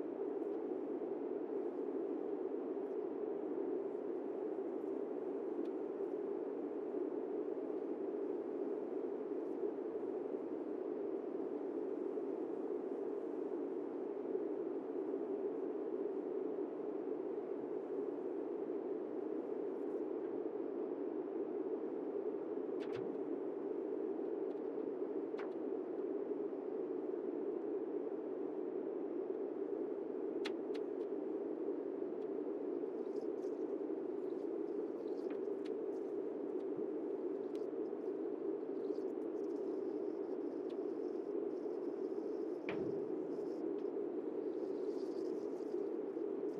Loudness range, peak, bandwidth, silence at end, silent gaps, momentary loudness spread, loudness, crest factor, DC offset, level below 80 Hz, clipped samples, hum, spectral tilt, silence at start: 1 LU; -28 dBFS; 6.6 kHz; 0 s; none; 1 LU; -42 LUFS; 14 dB; under 0.1%; under -90 dBFS; under 0.1%; none; -8 dB/octave; 0 s